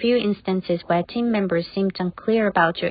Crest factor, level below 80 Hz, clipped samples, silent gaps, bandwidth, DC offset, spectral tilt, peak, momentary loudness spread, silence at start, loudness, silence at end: 18 dB; -56 dBFS; under 0.1%; none; 5 kHz; under 0.1%; -11 dB/octave; -4 dBFS; 5 LU; 0 s; -22 LUFS; 0 s